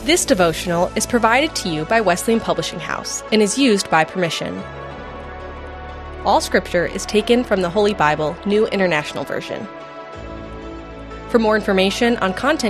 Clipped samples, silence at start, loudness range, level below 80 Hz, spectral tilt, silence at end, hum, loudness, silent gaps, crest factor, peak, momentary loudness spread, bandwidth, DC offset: under 0.1%; 0 s; 4 LU; -40 dBFS; -4 dB/octave; 0 s; none; -18 LUFS; none; 18 dB; 0 dBFS; 17 LU; 14 kHz; under 0.1%